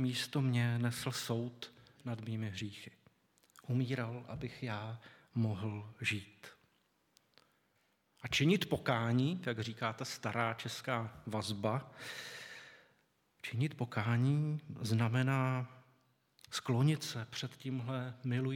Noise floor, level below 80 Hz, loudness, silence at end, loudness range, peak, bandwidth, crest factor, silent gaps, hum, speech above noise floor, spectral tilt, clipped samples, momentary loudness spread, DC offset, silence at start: -76 dBFS; -72 dBFS; -37 LUFS; 0 s; 6 LU; -16 dBFS; 17.5 kHz; 22 dB; none; none; 40 dB; -5.5 dB/octave; under 0.1%; 16 LU; under 0.1%; 0 s